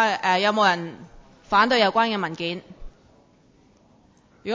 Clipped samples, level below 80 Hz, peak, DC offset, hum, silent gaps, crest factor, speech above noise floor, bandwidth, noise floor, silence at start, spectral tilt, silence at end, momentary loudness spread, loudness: under 0.1%; -54 dBFS; -6 dBFS; under 0.1%; none; none; 18 dB; 35 dB; 7.6 kHz; -57 dBFS; 0 s; -4 dB/octave; 0 s; 16 LU; -21 LUFS